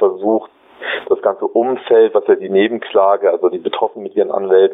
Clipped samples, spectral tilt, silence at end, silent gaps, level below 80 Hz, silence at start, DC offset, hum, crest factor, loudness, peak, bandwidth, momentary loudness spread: under 0.1%; -9 dB/octave; 0 s; none; -68 dBFS; 0 s; under 0.1%; none; 12 dB; -15 LUFS; -2 dBFS; 3.9 kHz; 8 LU